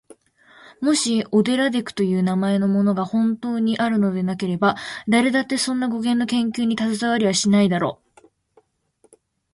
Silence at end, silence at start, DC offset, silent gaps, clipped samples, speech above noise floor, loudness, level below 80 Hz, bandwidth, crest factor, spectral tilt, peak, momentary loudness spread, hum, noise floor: 1.6 s; 0.7 s; under 0.1%; none; under 0.1%; 42 dB; -20 LUFS; -62 dBFS; 11.5 kHz; 18 dB; -5 dB/octave; -4 dBFS; 5 LU; none; -62 dBFS